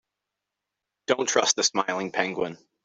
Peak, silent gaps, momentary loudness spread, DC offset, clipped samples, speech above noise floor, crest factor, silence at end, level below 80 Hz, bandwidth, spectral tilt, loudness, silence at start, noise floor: -6 dBFS; none; 11 LU; under 0.1%; under 0.1%; 60 dB; 22 dB; 0.3 s; -72 dBFS; 8.2 kHz; -1.5 dB/octave; -25 LUFS; 1.1 s; -85 dBFS